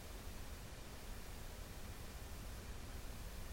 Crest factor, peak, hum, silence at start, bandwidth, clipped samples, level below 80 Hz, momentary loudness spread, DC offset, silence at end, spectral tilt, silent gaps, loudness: 12 dB; -38 dBFS; none; 0 s; 16.5 kHz; under 0.1%; -52 dBFS; 1 LU; under 0.1%; 0 s; -4 dB/octave; none; -52 LUFS